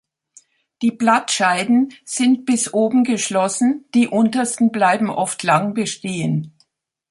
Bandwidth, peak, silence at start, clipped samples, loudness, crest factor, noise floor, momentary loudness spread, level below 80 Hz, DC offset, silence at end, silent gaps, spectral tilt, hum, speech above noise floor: 11.5 kHz; 0 dBFS; 0.8 s; under 0.1%; -18 LUFS; 18 dB; -63 dBFS; 7 LU; -66 dBFS; under 0.1%; 0.6 s; none; -4 dB/octave; none; 45 dB